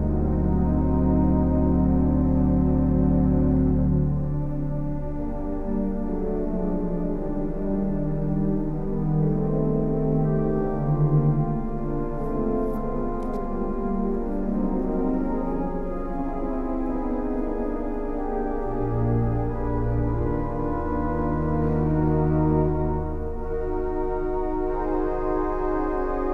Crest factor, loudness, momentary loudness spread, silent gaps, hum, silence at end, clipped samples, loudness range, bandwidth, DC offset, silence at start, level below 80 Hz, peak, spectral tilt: 14 dB; -25 LUFS; 8 LU; none; none; 0 s; under 0.1%; 6 LU; 2.8 kHz; under 0.1%; 0 s; -28 dBFS; -10 dBFS; -12 dB/octave